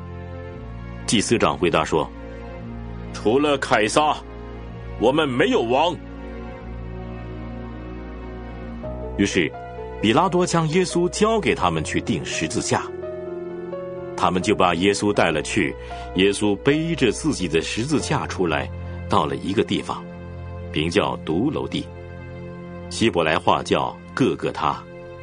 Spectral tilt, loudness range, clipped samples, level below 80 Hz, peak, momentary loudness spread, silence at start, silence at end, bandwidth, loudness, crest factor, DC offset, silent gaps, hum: -5 dB/octave; 5 LU; under 0.1%; -40 dBFS; -2 dBFS; 16 LU; 0 s; 0 s; 10 kHz; -21 LUFS; 22 dB; under 0.1%; none; none